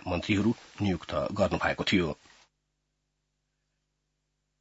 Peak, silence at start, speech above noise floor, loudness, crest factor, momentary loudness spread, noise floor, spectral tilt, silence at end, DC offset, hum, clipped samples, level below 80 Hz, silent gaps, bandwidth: -12 dBFS; 0.05 s; 51 dB; -29 LUFS; 20 dB; 6 LU; -80 dBFS; -6 dB/octave; 2.45 s; under 0.1%; 50 Hz at -55 dBFS; under 0.1%; -56 dBFS; none; 8 kHz